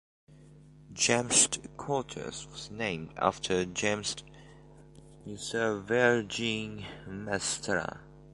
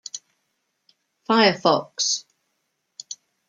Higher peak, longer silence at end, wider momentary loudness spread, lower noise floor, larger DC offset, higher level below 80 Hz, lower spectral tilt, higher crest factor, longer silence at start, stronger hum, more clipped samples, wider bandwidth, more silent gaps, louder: second, -8 dBFS vs -2 dBFS; second, 0 s vs 0.35 s; second, 18 LU vs 21 LU; second, -54 dBFS vs -75 dBFS; neither; first, -58 dBFS vs -76 dBFS; about the same, -2.5 dB/octave vs -2.5 dB/octave; about the same, 24 dB vs 22 dB; first, 0.3 s vs 0.15 s; neither; neither; first, 11.5 kHz vs 10 kHz; neither; second, -30 LUFS vs -20 LUFS